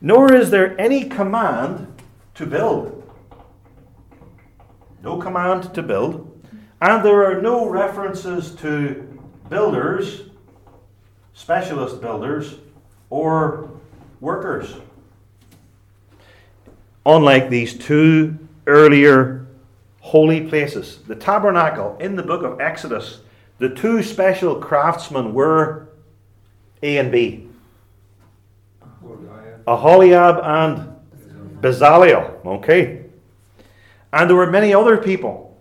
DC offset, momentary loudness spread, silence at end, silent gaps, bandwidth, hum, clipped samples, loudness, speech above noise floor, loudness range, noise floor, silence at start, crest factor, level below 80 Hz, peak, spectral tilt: under 0.1%; 18 LU; 0.15 s; none; 14.5 kHz; none; under 0.1%; -16 LUFS; 37 dB; 12 LU; -52 dBFS; 0 s; 18 dB; -56 dBFS; 0 dBFS; -7 dB/octave